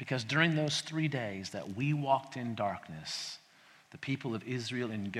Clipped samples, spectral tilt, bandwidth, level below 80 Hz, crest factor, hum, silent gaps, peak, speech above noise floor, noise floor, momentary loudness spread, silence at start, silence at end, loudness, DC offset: under 0.1%; -5 dB/octave; 13 kHz; -74 dBFS; 24 dB; none; none; -10 dBFS; 27 dB; -61 dBFS; 12 LU; 0 s; 0 s; -34 LUFS; under 0.1%